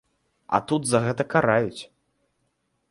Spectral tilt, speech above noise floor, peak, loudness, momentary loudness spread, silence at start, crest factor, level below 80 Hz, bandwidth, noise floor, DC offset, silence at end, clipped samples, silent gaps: -5 dB/octave; 50 dB; -4 dBFS; -23 LUFS; 8 LU; 0.5 s; 22 dB; -60 dBFS; 11.5 kHz; -73 dBFS; under 0.1%; 1.05 s; under 0.1%; none